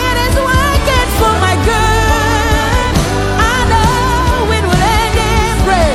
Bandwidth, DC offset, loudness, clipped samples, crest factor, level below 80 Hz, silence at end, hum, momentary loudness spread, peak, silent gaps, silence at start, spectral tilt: 16.5 kHz; under 0.1%; -12 LUFS; under 0.1%; 10 dB; -18 dBFS; 0 s; none; 2 LU; 0 dBFS; none; 0 s; -4.5 dB/octave